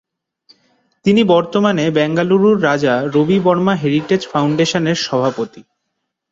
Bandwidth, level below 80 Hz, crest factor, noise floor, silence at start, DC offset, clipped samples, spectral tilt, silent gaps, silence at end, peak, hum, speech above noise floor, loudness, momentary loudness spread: 7.8 kHz; -56 dBFS; 14 dB; -74 dBFS; 1.05 s; under 0.1%; under 0.1%; -6 dB/octave; none; 0.7 s; -2 dBFS; none; 60 dB; -15 LUFS; 5 LU